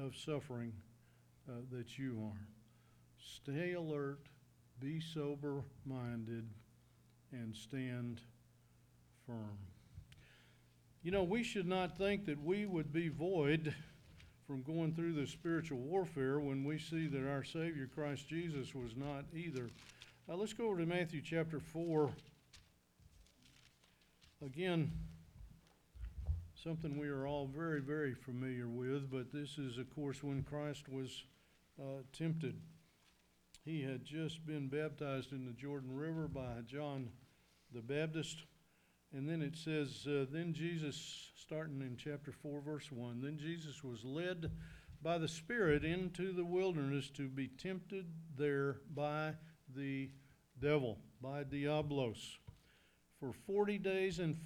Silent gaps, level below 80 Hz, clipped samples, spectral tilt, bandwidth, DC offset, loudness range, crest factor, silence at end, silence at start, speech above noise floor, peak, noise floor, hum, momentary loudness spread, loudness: none; -64 dBFS; under 0.1%; -6.5 dB/octave; 14.5 kHz; under 0.1%; 7 LU; 22 dB; 0 s; 0 s; 32 dB; -22 dBFS; -74 dBFS; none; 15 LU; -43 LUFS